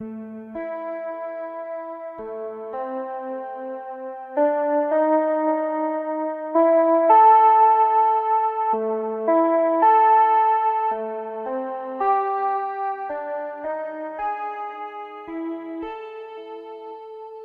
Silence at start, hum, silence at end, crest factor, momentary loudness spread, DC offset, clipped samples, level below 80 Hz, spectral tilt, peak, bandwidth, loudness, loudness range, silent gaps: 0 s; none; 0 s; 16 dB; 19 LU; under 0.1%; under 0.1%; -68 dBFS; -8 dB/octave; -6 dBFS; 4.2 kHz; -21 LUFS; 14 LU; none